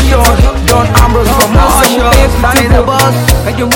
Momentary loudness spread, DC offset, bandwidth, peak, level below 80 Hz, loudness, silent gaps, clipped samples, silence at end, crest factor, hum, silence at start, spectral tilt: 3 LU; under 0.1%; over 20 kHz; 0 dBFS; -12 dBFS; -8 LUFS; none; 5%; 0 s; 6 dB; none; 0 s; -4.5 dB/octave